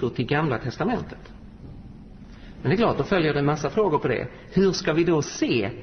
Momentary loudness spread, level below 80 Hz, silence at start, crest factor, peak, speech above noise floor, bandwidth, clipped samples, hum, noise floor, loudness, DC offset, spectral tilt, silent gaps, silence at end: 22 LU; -46 dBFS; 0 s; 16 dB; -8 dBFS; 20 dB; 6.6 kHz; under 0.1%; none; -43 dBFS; -24 LUFS; 0.1%; -6 dB/octave; none; 0 s